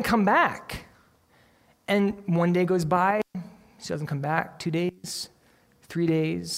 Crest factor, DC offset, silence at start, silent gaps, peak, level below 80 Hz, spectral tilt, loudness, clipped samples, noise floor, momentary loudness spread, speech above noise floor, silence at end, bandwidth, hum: 20 dB; under 0.1%; 0 s; none; -8 dBFS; -56 dBFS; -6 dB/octave; -26 LUFS; under 0.1%; -61 dBFS; 18 LU; 36 dB; 0 s; 16 kHz; none